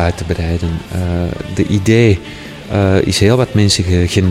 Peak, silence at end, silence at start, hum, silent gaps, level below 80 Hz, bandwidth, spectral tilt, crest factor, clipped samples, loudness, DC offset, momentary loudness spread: 0 dBFS; 0 s; 0 s; none; none; -30 dBFS; 14.5 kHz; -5.5 dB/octave; 14 dB; under 0.1%; -14 LUFS; under 0.1%; 9 LU